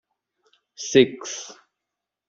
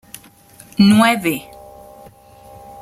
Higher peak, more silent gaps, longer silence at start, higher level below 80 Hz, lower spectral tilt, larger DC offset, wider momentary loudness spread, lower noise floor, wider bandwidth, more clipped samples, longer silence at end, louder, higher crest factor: about the same, -2 dBFS vs -2 dBFS; neither; about the same, 0.8 s vs 0.8 s; second, -68 dBFS vs -54 dBFS; about the same, -4 dB/octave vs -5 dB/octave; neither; second, 17 LU vs 26 LU; first, -85 dBFS vs -45 dBFS; second, 7.6 kHz vs 15.5 kHz; neither; second, 0.75 s vs 1.4 s; second, -21 LUFS vs -14 LUFS; first, 24 dB vs 16 dB